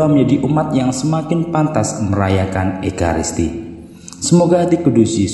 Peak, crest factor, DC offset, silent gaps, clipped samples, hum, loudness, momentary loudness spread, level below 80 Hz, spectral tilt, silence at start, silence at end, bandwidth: 0 dBFS; 14 dB; under 0.1%; none; under 0.1%; none; -16 LUFS; 9 LU; -38 dBFS; -6 dB/octave; 0 s; 0 s; 11.5 kHz